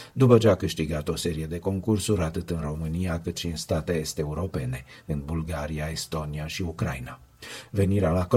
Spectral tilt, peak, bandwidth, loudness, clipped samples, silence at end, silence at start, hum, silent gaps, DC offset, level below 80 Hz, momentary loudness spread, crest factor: -6 dB/octave; -4 dBFS; 16.5 kHz; -27 LUFS; under 0.1%; 0 s; 0 s; none; none; under 0.1%; -42 dBFS; 11 LU; 22 dB